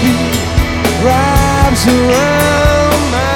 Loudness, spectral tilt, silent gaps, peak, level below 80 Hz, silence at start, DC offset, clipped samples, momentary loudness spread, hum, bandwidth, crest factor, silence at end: -11 LUFS; -5 dB/octave; none; 0 dBFS; -20 dBFS; 0 s; under 0.1%; under 0.1%; 4 LU; none; 19 kHz; 10 dB; 0 s